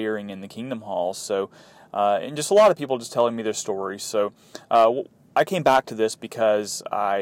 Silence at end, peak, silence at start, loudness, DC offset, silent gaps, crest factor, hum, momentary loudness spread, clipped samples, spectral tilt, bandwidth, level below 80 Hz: 0 s; -8 dBFS; 0 s; -23 LUFS; under 0.1%; none; 16 dB; none; 12 LU; under 0.1%; -4 dB/octave; 16.5 kHz; -68 dBFS